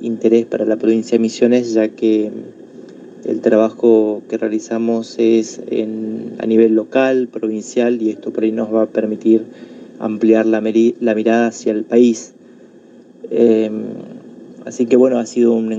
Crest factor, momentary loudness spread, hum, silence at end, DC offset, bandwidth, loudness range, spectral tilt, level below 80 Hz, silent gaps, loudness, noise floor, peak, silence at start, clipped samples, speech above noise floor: 16 dB; 12 LU; none; 0 s; under 0.1%; 7.8 kHz; 2 LU; -6 dB/octave; -72 dBFS; none; -16 LUFS; -43 dBFS; 0 dBFS; 0 s; under 0.1%; 28 dB